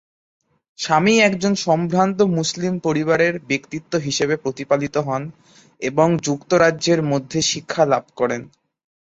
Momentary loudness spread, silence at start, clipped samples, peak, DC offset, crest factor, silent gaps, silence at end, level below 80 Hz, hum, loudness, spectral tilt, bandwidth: 8 LU; 0.8 s; under 0.1%; -2 dBFS; under 0.1%; 18 dB; none; 0.65 s; -58 dBFS; none; -19 LUFS; -4.5 dB/octave; 8.2 kHz